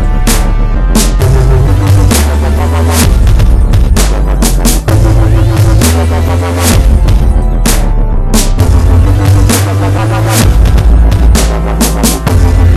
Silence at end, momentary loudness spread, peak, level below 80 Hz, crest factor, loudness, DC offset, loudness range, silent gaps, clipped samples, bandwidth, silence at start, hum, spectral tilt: 0 s; 3 LU; 0 dBFS; -8 dBFS; 6 dB; -9 LUFS; 1%; 1 LU; none; 3%; 14 kHz; 0 s; none; -5.5 dB/octave